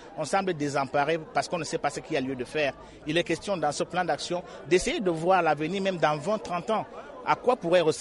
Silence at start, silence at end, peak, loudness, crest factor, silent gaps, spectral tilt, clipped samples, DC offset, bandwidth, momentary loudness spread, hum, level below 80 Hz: 0 s; 0 s; -8 dBFS; -27 LUFS; 20 dB; none; -4.5 dB/octave; under 0.1%; under 0.1%; 11.5 kHz; 7 LU; none; -56 dBFS